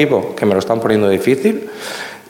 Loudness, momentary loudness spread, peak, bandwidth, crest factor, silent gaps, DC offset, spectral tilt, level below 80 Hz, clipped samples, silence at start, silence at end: -16 LUFS; 11 LU; -2 dBFS; 17 kHz; 14 dB; none; under 0.1%; -6 dB/octave; -58 dBFS; under 0.1%; 0 s; 0.1 s